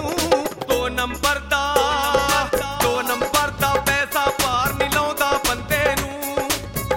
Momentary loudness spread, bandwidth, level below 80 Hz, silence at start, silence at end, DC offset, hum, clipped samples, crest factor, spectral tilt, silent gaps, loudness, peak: 5 LU; 17 kHz; -38 dBFS; 0 s; 0 s; under 0.1%; none; under 0.1%; 20 dB; -3 dB/octave; none; -20 LUFS; -2 dBFS